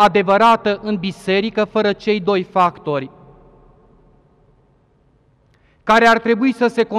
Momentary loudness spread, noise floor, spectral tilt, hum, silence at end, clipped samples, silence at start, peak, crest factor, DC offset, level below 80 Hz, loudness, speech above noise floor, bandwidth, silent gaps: 11 LU; -56 dBFS; -5.5 dB/octave; none; 0 s; under 0.1%; 0 s; -4 dBFS; 14 dB; under 0.1%; -52 dBFS; -16 LUFS; 41 dB; 13 kHz; none